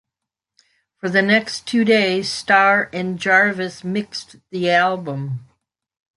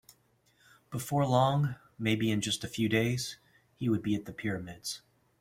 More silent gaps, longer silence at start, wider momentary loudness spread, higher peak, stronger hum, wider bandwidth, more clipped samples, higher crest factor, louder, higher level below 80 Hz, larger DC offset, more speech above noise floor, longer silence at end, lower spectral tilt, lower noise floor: neither; first, 1.05 s vs 0.9 s; about the same, 15 LU vs 13 LU; first, -2 dBFS vs -12 dBFS; neither; second, 11.5 kHz vs 16.5 kHz; neither; about the same, 18 dB vs 20 dB; first, -18 LUFS vs -31 LUFS; about the same, -64 dBFS vs -64 dBFS; neither; first, 66 dB vs 38 dB; first, 0.75 s vs 0.4 s; about the same, -4.5 dB/octave vs -5.5 dB/octave; first, -84 dBFS vs -69 dBFS